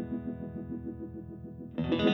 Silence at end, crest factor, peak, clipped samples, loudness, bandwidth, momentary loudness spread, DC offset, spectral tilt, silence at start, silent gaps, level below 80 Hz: 0 s; 20 dB; -14 dBFS; under 0.1%; -37 LUFS; 6.2 kHz; 12 LU; under 0.1%; -8 dB/octave; 0 s; none; -54 dBFS